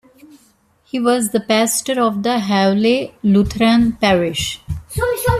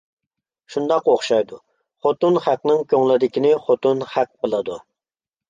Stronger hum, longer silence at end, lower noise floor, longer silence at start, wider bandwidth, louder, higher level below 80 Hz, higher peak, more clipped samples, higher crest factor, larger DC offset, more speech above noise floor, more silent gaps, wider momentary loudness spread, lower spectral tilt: neither; second, 0 s vs 0.7 s; second, -56 dBFS vs under -90 dBFS; first, 0.95 s vs 0.7 s; first, 14.5 kHz vs 9.4 kHz; first, -16 LUFS vs -19 LUFS; first, -38 dBFS vs -68 dBFS; about the same, -2 dBFS vs -4 dBFS; neither; about the same, 14 dB vs 16 dB; neither; second, 40 dB vs over 72 dB; neither; about the same, 8 LU vs 9 LU; second, -4.5 dB/octave vs -6 dB/octave